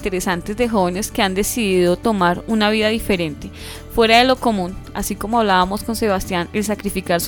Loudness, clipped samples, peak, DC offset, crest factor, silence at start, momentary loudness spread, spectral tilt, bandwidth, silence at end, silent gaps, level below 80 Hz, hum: -18 LUFS; under 0.1%; -2 dBFS; under 0.1%; 16 dB; 0 s; 11 LU; -4 dB/octave; over 20 kHz; 0 s; none; -36 dBFS; none